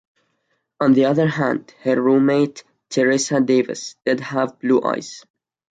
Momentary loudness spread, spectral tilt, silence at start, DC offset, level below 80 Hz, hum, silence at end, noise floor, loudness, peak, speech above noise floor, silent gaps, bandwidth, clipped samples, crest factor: 10 LU; -5.5 dB/octave; 0.8 s; under 0.1%; -66 dBFS; none; 0.5 s; -70 dBFS; -19 LUFS; -4 dBFS; 52 dB; none; 9.2 kHz; under 0.1%; 14 dB